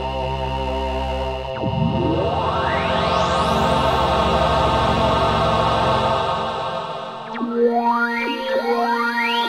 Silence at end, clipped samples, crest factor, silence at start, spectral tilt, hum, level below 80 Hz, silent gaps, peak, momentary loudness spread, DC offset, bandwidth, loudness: 0 s; under 0.1%; 14 dB; 0 s; -6 dB/octave; none; -32 dBFS; none; -4 dBFS; 7 LU; 0.1%; 15.5 kHz; -20 LUFS